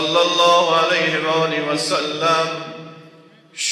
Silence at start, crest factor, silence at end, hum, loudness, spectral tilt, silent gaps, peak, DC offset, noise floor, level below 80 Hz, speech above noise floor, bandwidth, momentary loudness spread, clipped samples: 0 s; 16 dB; 0 s; none; -17 LUFS; -2.5 dB/octave; none; -4 dBFS; under 0.1%; -47 dBFS; -70 dBFS; 29 dB; 13.5 kHz; 16 LU; under 0.1%